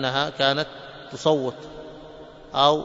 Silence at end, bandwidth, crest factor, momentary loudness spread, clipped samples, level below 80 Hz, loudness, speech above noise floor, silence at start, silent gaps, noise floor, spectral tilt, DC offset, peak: 0 s; 7.8 kHz; 22 dB; 21 LU; under 0.1%; -56 dBFS; -23 LUFS; 20 dB; 0 s; none; -43 dBFS; -4.5 dB/octave; under 0.1%; -2 dBFS